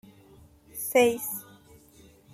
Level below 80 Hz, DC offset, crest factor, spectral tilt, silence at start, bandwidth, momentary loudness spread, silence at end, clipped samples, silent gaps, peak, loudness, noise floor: -64 dBFS; under 0.1%; 22 dB; -3 dB/octave; 0.75 s; 16 kHz; 16 LU; 0.9 s; under 0.1%; none; -8 dBFS; -26 LUFS; -56 dBFS